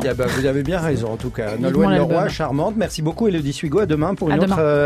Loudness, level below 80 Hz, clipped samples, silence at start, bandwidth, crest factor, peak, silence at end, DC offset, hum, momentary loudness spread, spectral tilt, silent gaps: -19 LUFS; -38 dBFS; under 0.1%; 0 s; 14.5 kHz; 14 dB; -4 dBFS; 0 s; under 0.1%; none; 6 LU; -6.5 dB/octave; none